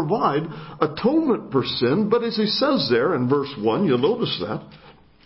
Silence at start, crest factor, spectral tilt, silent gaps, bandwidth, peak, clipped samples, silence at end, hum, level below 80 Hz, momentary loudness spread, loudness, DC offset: 0 s; 18 dB; -10 dB/octave; none; 5.8 kHz; -4 dBFS; under 0.1%; 0.35 s; none; -56 dBFS; 7 LU; -21 LUFS; under 0.1%